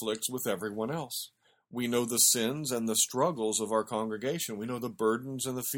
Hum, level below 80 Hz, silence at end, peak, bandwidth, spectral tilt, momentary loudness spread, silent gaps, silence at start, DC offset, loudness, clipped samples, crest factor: none; -72 dBFS; 0 s; -10 dBFS; 18 kHz; -3 dB/octave; 12 LU; none; 0 s; under 0.1%; -30 LUFS; under 0.1%; 20 dB